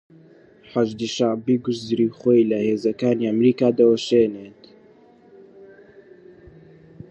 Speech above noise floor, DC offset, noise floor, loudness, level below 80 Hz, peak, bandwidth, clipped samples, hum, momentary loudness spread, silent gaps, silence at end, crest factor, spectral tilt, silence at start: 32 dB; under 0.1%; -51 dBFS; -20 LUFS; -64 dBFS; -4 dBFS; 8.4 kHz; under 0.1%; none; 7 LU; none; 1.45 s; 18 dB; -6.5 dB/octave; 0.75 s